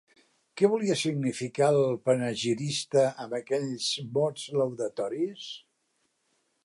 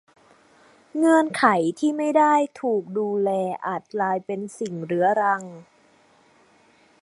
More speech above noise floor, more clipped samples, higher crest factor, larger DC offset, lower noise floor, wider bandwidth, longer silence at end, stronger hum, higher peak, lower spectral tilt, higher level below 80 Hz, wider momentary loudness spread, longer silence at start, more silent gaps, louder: first, 47 dB vs 36 dB; neither; about the same, 18 dB vs 22 dB; neither; first, -75 dBFS vs -58 dBFS; about the same, 11.5 kHz vs 11.5 kHz; second, 1.05 s vs 1.4 s; neither; second, -10 dBFS vs -2 dBFS; about the same, -5 dB/octave vs -6 dB/octave; about the same, -76 dBFS vs -74 dBFS; second, 9 LU vs 12 LU; second, 0.55 s vs 0.95 s; neither; second, -28 LUFS vs -22 LUFS